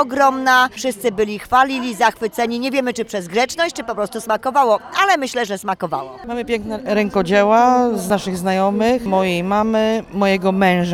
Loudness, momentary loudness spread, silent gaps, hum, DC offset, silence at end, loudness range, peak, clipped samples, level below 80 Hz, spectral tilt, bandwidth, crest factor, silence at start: -17 LUFS; 9 LU; none; none; under 0.1%; 0 s; 3 LU; 0 dBFS; under 0.1%; -48 dBFS; -5 dB/octave; 16.5 kHz; 16 dB; 0 s